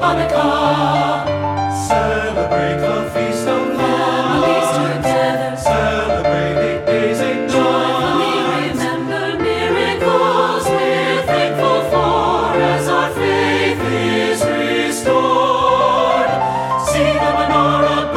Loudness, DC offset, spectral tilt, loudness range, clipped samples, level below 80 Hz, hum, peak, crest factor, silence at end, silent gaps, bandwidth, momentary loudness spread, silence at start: -16 LUFS; under 0.1%; -5 dB/octave; 2 LU; under 0.1%; -38 dBFS; none; -2 dBFS; 14 dB; 0 s; none; 16 kHz; 4 LU; 0 s